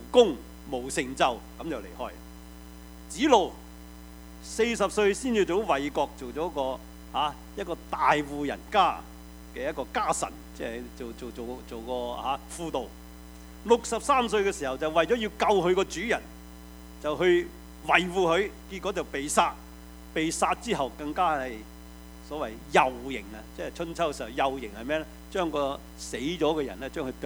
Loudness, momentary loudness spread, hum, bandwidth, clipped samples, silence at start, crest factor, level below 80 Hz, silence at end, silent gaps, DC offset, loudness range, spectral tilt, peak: -28 LUFS; 22 LU; none; over 20 kHz; under 0.1%; 0 s; 24 dB; -48 dBFS; 0 s; none; under 0.1%; 5 LU; -4 dB/octave; -4 dBFS